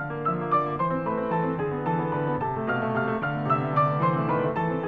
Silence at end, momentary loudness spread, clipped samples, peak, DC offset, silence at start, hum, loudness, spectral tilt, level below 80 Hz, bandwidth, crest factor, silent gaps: 0 s; 4 LU; under 0.1%; -10 dBFS; 0.2%; 0 s; none; -26 LUFS; -10 dB/octave; -58 dBFS; 5 kHz; 16 dB; none